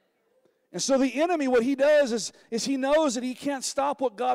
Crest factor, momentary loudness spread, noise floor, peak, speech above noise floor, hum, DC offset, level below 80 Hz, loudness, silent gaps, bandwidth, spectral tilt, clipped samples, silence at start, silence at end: 10 dB; 10 LU; -67 dBFS; -16 dBFS; 43 dB; none; under 0.1%; -64 dBFS; -25 LUFS; none; 15.5 kHz; -3 dB/octave; under 0.1%; 0.75 s; 0 s